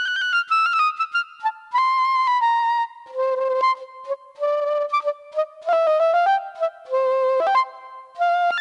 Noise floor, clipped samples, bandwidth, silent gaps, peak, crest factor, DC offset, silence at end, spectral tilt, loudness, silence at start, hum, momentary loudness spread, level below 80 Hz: -40 dBFS; under 0.1%; 10.5 kHz; none; -8 dBFS; 12 dB; under 0.1%; 0 s; 0.5 dB/octave; -21 LUFS; 0 s; none; 10 LU; -86 dBFS